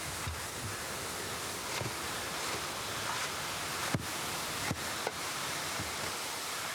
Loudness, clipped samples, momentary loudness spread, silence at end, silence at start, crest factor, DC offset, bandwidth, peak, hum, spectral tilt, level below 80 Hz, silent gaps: -36 LUFS; under 0.1%; 3 LU; 0 s; 0 s; 20 dB; under 0.1%; over 20 kHz; -16 dBFS; none; -2 dB/octave; -58 dBFS; none